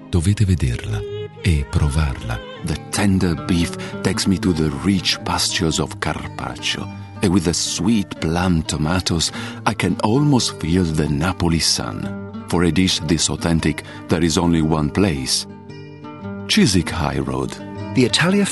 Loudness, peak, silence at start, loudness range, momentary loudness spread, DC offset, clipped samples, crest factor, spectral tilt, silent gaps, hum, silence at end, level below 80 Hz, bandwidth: -19 LUFS; 0 dBFS; 0 s; 2 LU; 11 LU; 0.1%; under 0.1%; 18 dB; -4.5 dB/octave; none; none; 0 s; -34 dBFS; 12 kHz